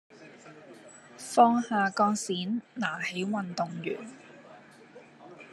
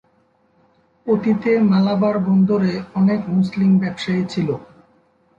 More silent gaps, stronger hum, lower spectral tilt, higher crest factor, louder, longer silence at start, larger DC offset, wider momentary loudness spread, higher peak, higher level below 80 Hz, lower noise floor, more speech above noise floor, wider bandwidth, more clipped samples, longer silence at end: neither; neither; second, -4.5 dB/octave vs -8.5 dB/octave; first, 22 dB vs 14 dB; second, -28 LUFS vs -18 LUFS; second, 0.2 s vs 1.05 s; neither; first, 27 LU vs 7 LU; about the same, -8 dBFS vs -6 dBFS; second, -82 dBFS vs -56 dBFS; second, -53 dBFS vs -60 dBFS; second, 25 dB vs 43 dB; first, 12.5 kHz vs 7.4 kHz; neither; second, 0 s vs 0.75 s